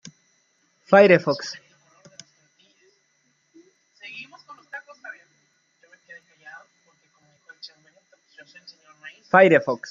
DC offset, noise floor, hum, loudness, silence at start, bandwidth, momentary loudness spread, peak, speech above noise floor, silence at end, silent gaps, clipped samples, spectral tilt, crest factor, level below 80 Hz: under 0.1%; -67 dBFS; none; -17 LUFS; 0.9 s; 7.4 kHz; 29 LU; -2 dBFS; 51 dB; 0.15 s; none; under 0.1%; -6 dB/octave; 24 dB; -74 dBFS